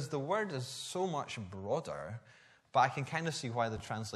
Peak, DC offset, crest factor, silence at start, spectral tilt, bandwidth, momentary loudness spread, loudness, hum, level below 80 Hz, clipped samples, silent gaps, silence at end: -16 dBFS; under 0.1%; 22 dB; 0 s; -4.5 dB/octave; 13 kHz; 12 LU; -36 LUFS; none; -68 dBFS; under 0.1%; none; 0 s